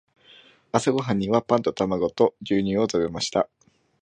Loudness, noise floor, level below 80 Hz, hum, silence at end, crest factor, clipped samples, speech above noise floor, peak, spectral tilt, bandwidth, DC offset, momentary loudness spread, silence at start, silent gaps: -24 LUFS; -53 dBFS; -56 dBFS; none; 0.55 s; 22 dB; under 0.1%; 30 dB; -4 dBFS; -5.5 dB/octave; 10 kHz; under 0.1%; 3 LU; 0.75 s; none